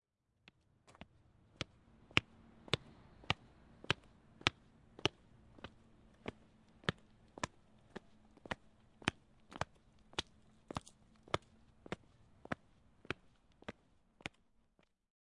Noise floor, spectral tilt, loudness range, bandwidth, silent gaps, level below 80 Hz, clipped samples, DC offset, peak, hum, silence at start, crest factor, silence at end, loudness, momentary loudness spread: -76 dBFS; -3.5 dB/octave; 9 LU; 11 kHz; none; -68 dBFS; under 0.1%; under 0.1%; -8 dBFS; none; 2.15 s; 40 dB; 1.6 s; -43 LUFS; 24 LU